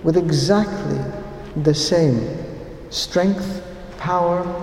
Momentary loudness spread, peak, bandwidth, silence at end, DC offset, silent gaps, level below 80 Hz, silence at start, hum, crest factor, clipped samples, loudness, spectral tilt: 15 LU; -2 dBFS; 15.5 kHz; 0 s; under 0.1%; none; -42 dBFS; 0 s; none; 18 dB; under 0.1%; -20 LUFS; -5.5 dB/octave